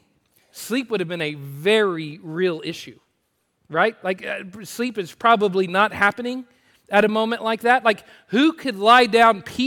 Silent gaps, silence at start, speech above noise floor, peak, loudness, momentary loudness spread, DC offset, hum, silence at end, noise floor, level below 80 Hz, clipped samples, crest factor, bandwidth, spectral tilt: none; 0.55 s; 51 dB; -2 dBFS; -20 LUFS; 15 LU; under 0.1%; none; 0 s; -71 dBFS; -66 dBFS; under 0.1%; 18 dB; 18 kHz; -4.5 dB/octave